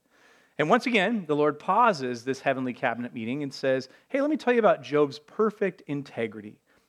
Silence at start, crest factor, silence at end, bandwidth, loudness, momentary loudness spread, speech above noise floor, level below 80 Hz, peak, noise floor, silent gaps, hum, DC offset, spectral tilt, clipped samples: 0.6 s; 20 dB; 0.4 s; 12 kHz; -26 LUFS; 11 LU; 34 dB; -82 dBFS; -6 dBFS; -60 dBFS; none; none; under 0.1%; -6 dB/octave; under 0.1%